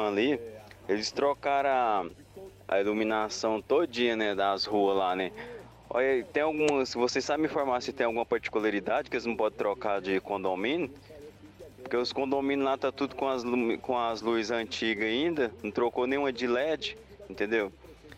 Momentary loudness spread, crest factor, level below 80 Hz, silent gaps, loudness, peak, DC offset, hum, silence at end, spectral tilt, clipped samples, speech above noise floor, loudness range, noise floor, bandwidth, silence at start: 10 LU; 16 dB; -62 dBFS; none; -29 LUFS; -12 dBFS; under 0.1%; none; 0 s; -4 dB/octave; under 0.1%; 21 dB; 3 LU; -50 dBFS; 14.5 kHz; 0 s